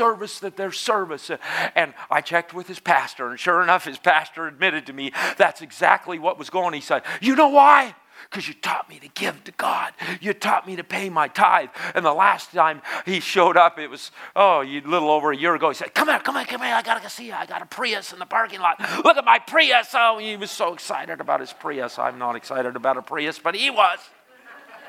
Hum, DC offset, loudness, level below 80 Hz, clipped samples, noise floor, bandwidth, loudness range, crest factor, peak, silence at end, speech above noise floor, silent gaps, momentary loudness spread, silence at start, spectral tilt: none; under 0.1%; -21 LUFS; -80 dBFS; under 0.1%; -47 dBFS; 16 kHz; 5 LU; 22 dB; 0 dBFS; 0 s; 26 dB; none; 13 LU; 0 s; -3 dB/octave